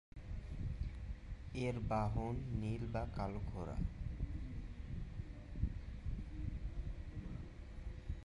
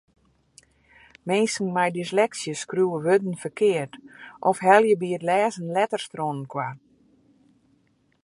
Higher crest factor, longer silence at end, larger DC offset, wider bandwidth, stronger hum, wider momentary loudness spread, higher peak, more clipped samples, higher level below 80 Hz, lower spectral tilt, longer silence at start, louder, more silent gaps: second, 18 dB vs 24 dB; second, 0.05 s vs 1.5 s; neither; about the same, 10.5 kHz vs 11.5 kHz; neither; second, 11 LU vs 14 LU; second, -24 dBFS vs -2 dBFS; neither; first, -46 dBFS vs -72 dBFS; first, -8 dB/octave vs -5 dB/octave; second, 0.15 s vs 1.25 s; second, -45 LUFS vs -24 LUFS; neither